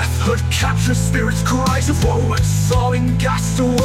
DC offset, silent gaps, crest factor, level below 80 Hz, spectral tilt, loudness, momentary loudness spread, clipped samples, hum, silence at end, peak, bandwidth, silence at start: under 0.1%; none; 12 dB; -26 dBFS; -5.5 dB/octave; -17 LUFS; 1 LU; under 0.1%; none; 0 s; -4 dBFS; 16 kHz; 0 s